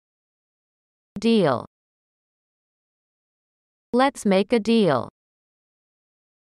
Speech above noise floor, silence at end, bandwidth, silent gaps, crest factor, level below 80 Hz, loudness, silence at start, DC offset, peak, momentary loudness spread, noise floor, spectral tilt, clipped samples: over 70 dB; 1.35 s; 12 kHz; 1.67-3.93 s; 20 dB; -64 dBFS; -21 LUFS; 1.15 s; under 0.1%; -6 dBFS; 9 LU; under -90 dBFS; -6 dB/octave; under 0.1%